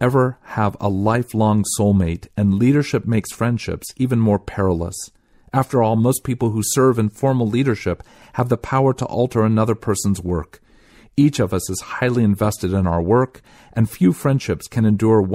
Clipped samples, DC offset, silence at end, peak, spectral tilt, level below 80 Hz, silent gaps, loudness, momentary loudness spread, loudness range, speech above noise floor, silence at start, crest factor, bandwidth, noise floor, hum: under 0.1%; under 0.1%; 0 s; -4 dBFS; -6.5 dB/octave; -42 dBFS; none; -19 LUFS; 8 LU; 2 LU; 31 dB; 0 s; 14 dB; 16 kHz; -49 dBFS; none